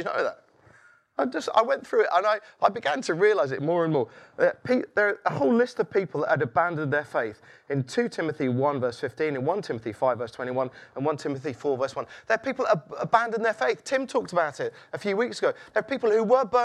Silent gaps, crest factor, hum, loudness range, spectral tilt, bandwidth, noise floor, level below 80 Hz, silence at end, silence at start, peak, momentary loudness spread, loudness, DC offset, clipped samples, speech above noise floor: none; 20 dB; none; 4 LU; -6 dB/octave; 11.5 kHz; -57 dBFS; -72 dBFS; 0 s; 0 s; -4 dBFS; 8 LU; -26 LUFS; under 0.1%; under 0.1%; 32 dB